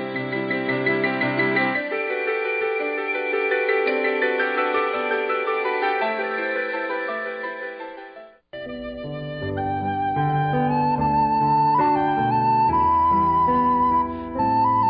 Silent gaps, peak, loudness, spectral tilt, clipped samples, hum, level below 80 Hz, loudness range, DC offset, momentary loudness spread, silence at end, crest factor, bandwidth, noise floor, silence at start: none; -8 dBFS; -22 LUFS; -11 dB/octave; under 0.1%; none; -48 dBFS; 9 LU; under 0.1%; 12 LU; 0 s; 12 dB; 5.2 kHz; -43 dBFS; 0 s